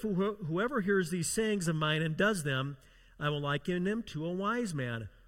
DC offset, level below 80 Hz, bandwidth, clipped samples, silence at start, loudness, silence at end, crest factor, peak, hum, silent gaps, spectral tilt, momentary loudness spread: under 0.1%; -60 dBFS; 16.5 kHz; under 0.1%; 0 s; -33 LUFS; 0.2 s; 18 dB; -16 dBFS; none; none; -5 dB/octave; 7 LU